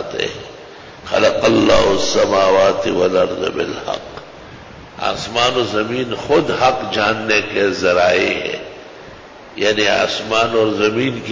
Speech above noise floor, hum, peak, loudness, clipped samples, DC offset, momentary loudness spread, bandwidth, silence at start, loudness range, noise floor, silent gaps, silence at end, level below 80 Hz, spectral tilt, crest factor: 21 dB; none; -4 dBFS; -16 LUFS; under 0.1%; under 0.1%; 22 LU; 7.6 kHz; 0 s; 4 LU; -37 dBFS; none; 0 s; -44 dBFS; -4 dB/octave; 14 dB